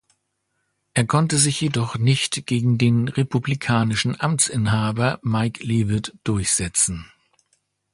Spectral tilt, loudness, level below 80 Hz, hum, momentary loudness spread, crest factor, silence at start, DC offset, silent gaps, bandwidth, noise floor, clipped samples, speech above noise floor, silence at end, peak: -4.5 dB/octave; -21 LUFS; -46 dBFS; none; 5 LU; 18 dB; 0.95 s; under 0.1%; none; 11.5 kHz; -73 dBFS; under 0.1%; 53 dB; 0.9 s; -4 dBFS